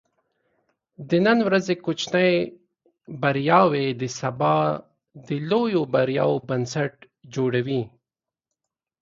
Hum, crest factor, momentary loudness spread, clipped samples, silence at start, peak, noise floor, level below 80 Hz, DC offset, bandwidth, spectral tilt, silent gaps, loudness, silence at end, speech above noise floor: none; 22 dB; 12 LU; under 0.1%; 1 s; -2 dBFS; -89 dBFS; -64 dBFS; under 0.1%; 7.6 kHz; -6 dB/octave; none; -23 LUFS; 1.15 s; 67 dB